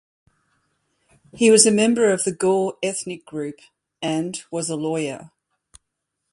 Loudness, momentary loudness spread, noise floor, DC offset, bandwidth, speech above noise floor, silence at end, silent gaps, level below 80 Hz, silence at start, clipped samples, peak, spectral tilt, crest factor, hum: -20 LUFS; 17 LU; -79 dBFS; under 0.1%; 11.5 kHz; 58 dB; 1.05 s; none; -64 dBFS; 1.35 s; under 0.1%; 0 dBFS; -3.5 dB/octave; 22 dB; none